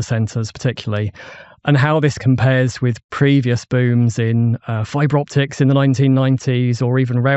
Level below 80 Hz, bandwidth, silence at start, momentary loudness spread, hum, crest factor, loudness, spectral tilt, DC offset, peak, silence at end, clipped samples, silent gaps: -52 dBFS; 8.2 kHz; 0 s; 8 LU; none; 12 dB; -17 LUFS; -7 dB/octave; under 0.1%; -2 dBFS; 0 s; under 0.1%; 3.04-3.09 s